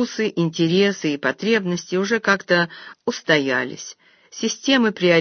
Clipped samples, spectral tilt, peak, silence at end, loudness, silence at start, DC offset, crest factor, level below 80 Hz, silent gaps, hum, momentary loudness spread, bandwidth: under 0.1%; -4.5 dB/octave; 0 dBFS; 0 s; -20 LUFS; 0 s; under 0.1%; 20 dB; -68 dBFS; none; none; 11 LU; 6.6 kHz